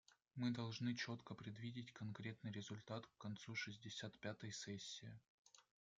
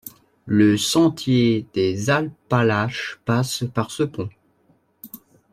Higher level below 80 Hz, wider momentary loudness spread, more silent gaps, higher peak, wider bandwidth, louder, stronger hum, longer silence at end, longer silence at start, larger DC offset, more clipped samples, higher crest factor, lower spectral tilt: second, -86 dBFS vs -58 dBFS; second, 9 LU vs 16 LU; first, 5.28-5.45 s vs none; second, -32 dBFS vs -4 dBFS; second, 9 kHz vs 15.5 kHz; second, -50 LUFS vs -20 LUFS; neither; about the same, 0.35 s vs 0.35 s; first, 0.35 s vs 0.05 s; neither; neither; about the same, 18 dB vs 18 dB; about the same, -4.5 dB/octave vs -5.5 dB/octave